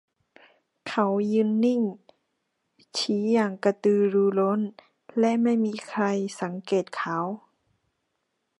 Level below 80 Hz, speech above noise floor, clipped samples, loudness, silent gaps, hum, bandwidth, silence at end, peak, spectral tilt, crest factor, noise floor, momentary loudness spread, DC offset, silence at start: -78 dBFS; 54 dB; under 0.1%; -25 LUFS; none; none; 11 kHz; 1.2 s; -8 dBFS; -6 dB/octave; 18 dB; -78 dBFS; 11 LU; under 0.1%; 0.85 s